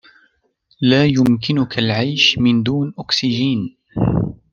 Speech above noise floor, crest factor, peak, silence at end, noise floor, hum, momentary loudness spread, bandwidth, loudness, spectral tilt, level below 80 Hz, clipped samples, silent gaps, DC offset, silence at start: 45 dB; 16 dB; -2 dBFS; 0.15 s; -61 dBFS; none; 8 LU; 7.2 kHz; -16 LUFS; -5.5 dB/octave; -42 dBFS; under 0.1%; none; under 0.1%; 0.8 s